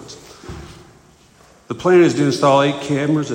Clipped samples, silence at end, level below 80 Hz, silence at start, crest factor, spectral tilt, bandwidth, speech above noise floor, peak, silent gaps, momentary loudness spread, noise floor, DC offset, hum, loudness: under 0.1%; 0 s; -50 dBFS; 0 s; 16 dB; -6 dB/octave; 10 kHz; 34 dB; -2 dBFS; none; 23 LU; -49 dBFS; under 0.1%; none; -15 LUFS